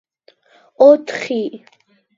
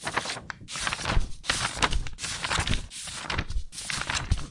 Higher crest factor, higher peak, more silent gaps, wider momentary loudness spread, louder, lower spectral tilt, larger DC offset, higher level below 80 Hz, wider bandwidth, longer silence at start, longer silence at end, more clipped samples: about the same, 18 dB vs 22 dB; first, 0 dBFS vs -6 dBFS; neither; first, 12 LU vs 9 LU; first, -14 LUFS vs -30 LUFS; first, -5 dB/octave vs -2.5 dB/octave; neither; second, -70 dBFS vs -34 dBFS; second, 7.6 kHz vs 11.5 kHz; first, 0.8 s vs 0 s; first, 0.6 s vs 0 s; neither